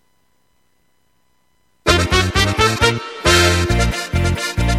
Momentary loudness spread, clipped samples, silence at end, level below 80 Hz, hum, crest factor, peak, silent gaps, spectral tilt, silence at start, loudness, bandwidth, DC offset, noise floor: 7 LU; under 0.1%; 0 s; -26 dBFS; none; 18 dB; 0 dBFS; none; -4 dB/octave; 1.85 s; -15 LUFS; 14.5 kHz; under 0.1%; -64 dBFS